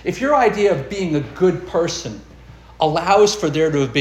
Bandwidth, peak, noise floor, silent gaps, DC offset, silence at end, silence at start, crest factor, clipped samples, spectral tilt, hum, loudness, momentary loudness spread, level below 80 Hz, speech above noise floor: 12.5 kHz; -2 dBFS; -41 dBFS; none; under 0.1%; 0 s; 0 s; 16 dB; under 0.1%; -5 dB/octave; none; -18 LUFS; 9 LU; -44 dBFS; 24 dB